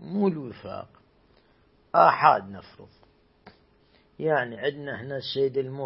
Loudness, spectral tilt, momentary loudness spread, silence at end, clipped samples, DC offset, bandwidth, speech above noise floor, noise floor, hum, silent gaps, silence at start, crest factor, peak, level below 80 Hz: -24 LUFS; -10 dB/octave; 20 LU; 0 s; under 0.1%; under 0.1%; 5.8 kHz; 36 dB; -62 dBFS; none; none; 0 s; 24 dB; -2 dBFS; -68 dBFS